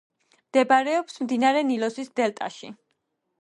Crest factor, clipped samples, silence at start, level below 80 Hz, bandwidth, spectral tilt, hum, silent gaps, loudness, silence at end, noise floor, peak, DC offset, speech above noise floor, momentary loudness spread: 18 dB; under 0.1%; 0.55 s; -78 dBFS; 11 kHz; -4 dB/octave; none; none; -24 LUFS; 0.7 s; -76 dBFS; -8 dBFS; under 0.1%; 52 dB; 14 LU